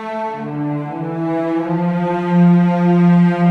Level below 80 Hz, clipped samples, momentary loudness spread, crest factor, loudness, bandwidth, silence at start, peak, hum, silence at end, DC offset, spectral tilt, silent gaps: -58 dBFS; under 0.1%; 12 LU; 10 dB; -16 LUFS; 4.4 kHz; 0 s; -4 dBFS; none; 0 s; under 0.1%; -10 dB/octave; none